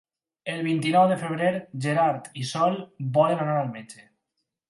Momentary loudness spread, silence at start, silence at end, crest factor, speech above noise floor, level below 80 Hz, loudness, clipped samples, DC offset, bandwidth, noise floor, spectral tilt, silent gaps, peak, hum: 12 LU; 0.45 s; 0.75 s; 18 dB; 56 dB; -72 dBFS; -25 LUFS; under 0.1%; under 0.1%; 11.5 kHz; -81 dBFS; -6 dB/octave; none; -8 dBFS; none